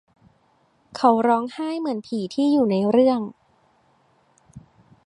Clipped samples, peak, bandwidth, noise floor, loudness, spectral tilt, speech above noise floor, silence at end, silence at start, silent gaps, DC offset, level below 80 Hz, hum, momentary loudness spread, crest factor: under 0.1%; -4 dBFS; 10.5 kHz; -62 dBFS; -21 LUFS; -7 dB/octave; 42 dB; 0.45 s; 0.95 s; none; under 0.1%; -66 dBFS; none; 10 LU; 20 dB